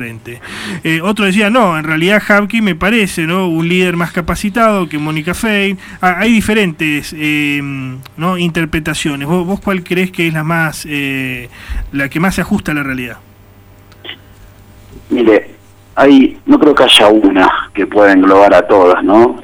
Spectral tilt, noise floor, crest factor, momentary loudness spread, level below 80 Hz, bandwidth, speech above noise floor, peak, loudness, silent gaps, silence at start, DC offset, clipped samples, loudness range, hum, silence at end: -5 dB/octave; -40 dBFS; 12 dB; 15 LU; -36 dBFS; 17.5 kHz; 29 dB; 0 dBFS; -11 LUFS; none; 0 s; under 0.1%; under 0.1%; 10 LU; none; 0 s